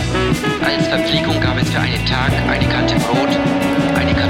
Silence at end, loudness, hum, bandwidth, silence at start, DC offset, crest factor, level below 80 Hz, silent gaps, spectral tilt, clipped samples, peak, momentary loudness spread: 0 s; -16 LUFS; none; 16.5 kHz; 0 s; under 0.1%; 12 dB; -30 dBFS; none; -5.5 dB/octave; under 0.1%; -4 dBFS; 1 LU